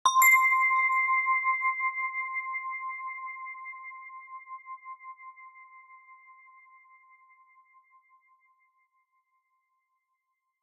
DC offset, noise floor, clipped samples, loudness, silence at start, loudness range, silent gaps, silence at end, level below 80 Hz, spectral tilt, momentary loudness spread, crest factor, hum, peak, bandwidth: under 0.1%; -81 dBFS; under 0.1%; -25 LUFS; 0.05 s; 24 LU; none; 4.3 s; under -90 dBFS; 5.5 dB/octave; 25 LU; 22 dB; none; -10 dBFS; 11.5 kHz